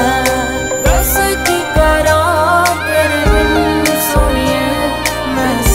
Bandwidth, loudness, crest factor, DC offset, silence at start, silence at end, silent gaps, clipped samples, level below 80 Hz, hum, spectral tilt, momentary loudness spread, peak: 16.5 kHz; -12 LUFS; 12 dB; under 0.1%; 0 s; 0 s; none; under 0.1%; -20 dBFS; none; -4 dB/octave; 4 LU; 0 dBFS